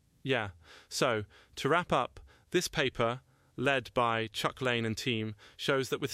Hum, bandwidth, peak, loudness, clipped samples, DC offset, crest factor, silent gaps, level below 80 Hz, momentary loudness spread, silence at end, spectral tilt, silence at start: none; 15.5 kHz; -14 dBFS; -32 LUFS; under 0.1%; under 0.1%; 20 dB; none; -60 dBFS; 10 LU; 0 s; -4 dB/octave; 0.25 s